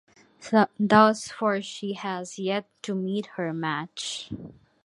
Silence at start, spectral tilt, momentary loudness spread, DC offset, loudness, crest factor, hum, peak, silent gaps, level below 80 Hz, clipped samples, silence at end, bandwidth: 0.4 s; -5 dB/octave; 14 LU; under 0.1%; -26 LUFS; 22 dB; none; -4 dBFS; none; -64 dBFS; under 0.1%; 0.35 s; 11.5 kHz